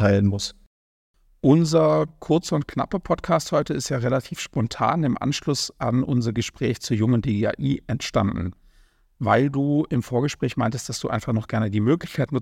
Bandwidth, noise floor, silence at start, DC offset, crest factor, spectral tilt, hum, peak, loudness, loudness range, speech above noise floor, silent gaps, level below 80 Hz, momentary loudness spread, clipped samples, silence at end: 16 kHz; -57 dBFS; 0 s; under 0.1%; 18 dB; -6 dB/octave; none; -4 dBFS; -23 LUFS; 2 LU; 35 dB; 0.66-1.14 s; -48 dBFS; 7 LU; under 0.1%; 0 s